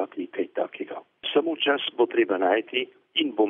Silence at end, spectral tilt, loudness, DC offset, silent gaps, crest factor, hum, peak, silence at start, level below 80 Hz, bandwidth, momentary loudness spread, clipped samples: 0 s; -6 dB/octave; -26 LUFS; under 0.1%; none; 16 dB; none; -8 dBFS; 0 s; -88 dBFS; 3.8 kHz; 9 LU; under 0.1%